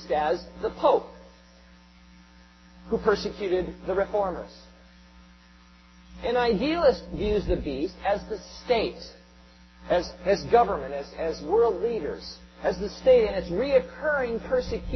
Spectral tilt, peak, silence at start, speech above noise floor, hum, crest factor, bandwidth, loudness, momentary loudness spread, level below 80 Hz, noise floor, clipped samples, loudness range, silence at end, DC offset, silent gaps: -6 dB/octave; -8 dBFS; 0 s; 28 dB; none; 20 dB; 6.4 kHz; -26 LUFS; 12 LU; -44 dBFS; -54 dBFS; under 0.1%; 5 LU; 0 s; under 0.1%; none